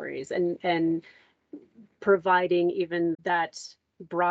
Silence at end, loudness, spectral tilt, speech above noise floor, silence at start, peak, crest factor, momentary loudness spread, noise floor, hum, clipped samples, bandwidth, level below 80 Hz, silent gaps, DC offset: 0 s; -26 LUFS; -5.5 dB/octave; 23 dB; 0 s; -10 dBFS; 16 dB; 11 LU; -49 dBFS; none; under 0.1%; 8 kHz; -74 dBFS; none; under 0.1%